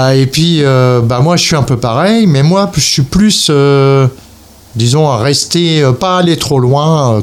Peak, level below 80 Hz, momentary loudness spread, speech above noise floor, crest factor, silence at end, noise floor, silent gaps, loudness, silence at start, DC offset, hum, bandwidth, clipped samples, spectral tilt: 0 dBFS; -34 dBFS; 3 LU; 29 dB; 8 dB; 0 s; -37 dBFS; none; -9 LUFS; 0 s; under 0.1%; none; 15.5 kHz; under 0.1%; -5 dB/octave